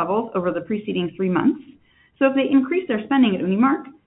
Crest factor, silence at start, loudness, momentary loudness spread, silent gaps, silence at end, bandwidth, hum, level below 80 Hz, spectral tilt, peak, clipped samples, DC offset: 16 dB; 0 s; -21 LUFS; 7 LU; none; 0.15 s; 4 kHz; none; -62 dBFS; -11.5 dB/octave; -4 dBFS; under 0.1%; under 0.1%